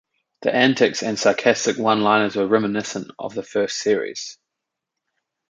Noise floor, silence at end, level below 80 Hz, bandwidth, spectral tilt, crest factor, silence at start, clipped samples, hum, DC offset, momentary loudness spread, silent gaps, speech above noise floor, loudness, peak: -83 dBFS; 1.15 s; -66 dBFS; 9.4 kHz; -4 dB/octave; 20 dB; 0.4 s; under 0.1%; none; under 0.1%; 13 LU; none; 63 dB; -20 LUFS; -2 dBFS